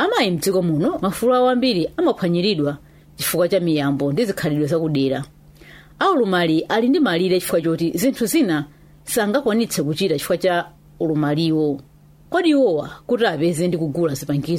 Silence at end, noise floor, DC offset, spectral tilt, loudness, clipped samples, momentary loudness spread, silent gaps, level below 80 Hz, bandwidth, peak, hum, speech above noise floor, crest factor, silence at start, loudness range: 0 s; -44 dBFS; under 0.1%; -5.5 dB/octave; -19 LUFS; under 0.1%; 7 LU; none; -52 dBFS; 16 kHz; -6 dBFS; none; 26 dB; 14 dB; 0 s; 2 LU